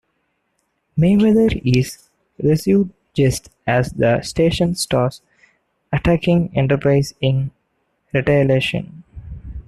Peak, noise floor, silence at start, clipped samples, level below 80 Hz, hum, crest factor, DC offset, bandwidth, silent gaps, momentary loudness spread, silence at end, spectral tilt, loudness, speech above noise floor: -2 dBFS; -69 dBFS; 0.95 s; under 0.1%; -38 dBFS; none; 16 dB; under 0.1%; 13 kHz; none; 12 LU; 0.05 s; -6.5 dB/octave; -18 LUFS; 53 dB